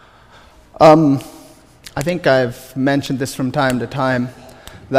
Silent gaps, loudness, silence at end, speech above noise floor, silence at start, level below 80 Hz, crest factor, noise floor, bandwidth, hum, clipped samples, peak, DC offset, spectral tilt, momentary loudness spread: none; -16 LUFS; 0 s; 30 dB; 0.8 s; -46 dBFS; 16 dB; -45 dBFS; 15.5 kHz; none; under 0.1%; 0 dBFS; under 0.1%; -6 dB/octave; 13 LU